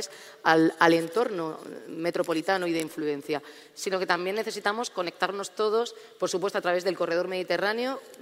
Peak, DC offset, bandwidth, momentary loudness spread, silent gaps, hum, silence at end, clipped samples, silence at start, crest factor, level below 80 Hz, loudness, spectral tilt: -6 dBFS; under 0.1%; 16 kHz; 12 LU; none; none; 0 s; under 0.1%; 0 s; 22 dB; -76 dBFS; -27 LUFS; -4 dB/octave